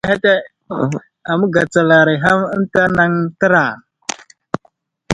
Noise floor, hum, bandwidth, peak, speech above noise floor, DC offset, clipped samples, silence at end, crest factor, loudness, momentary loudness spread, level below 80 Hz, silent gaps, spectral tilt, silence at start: -57 dBFS; none; 11 kHz; 0 dBFS; 43 dB; under 0.1%; under 0.1%; 0 s; 16 dB; -14 LUFS; 16 LU; -50 dBFS; none; -5.5 dB/octave; 0.05 s